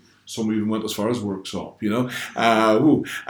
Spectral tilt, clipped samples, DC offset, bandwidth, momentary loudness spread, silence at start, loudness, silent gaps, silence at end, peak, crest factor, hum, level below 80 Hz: -5.5 dB/octave; under 0.1%; under 0.1%; over 20 kHz; 12 LU; 0.25 s; -22 LUFS; none; 0 s; -2 dBFS; 20 dB; none; -62 dBFS